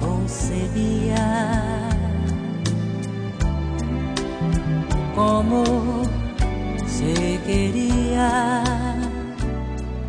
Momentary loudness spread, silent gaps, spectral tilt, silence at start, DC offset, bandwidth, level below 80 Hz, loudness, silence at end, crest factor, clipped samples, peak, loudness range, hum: 7 LU; none; -6 dB/octave; 0 s; under 0.1%; 10 kHz; -28 dBFS; -23 LUFS; 0 s; 14 dB; under 0.1%; -6 dBFS; 3 LU; none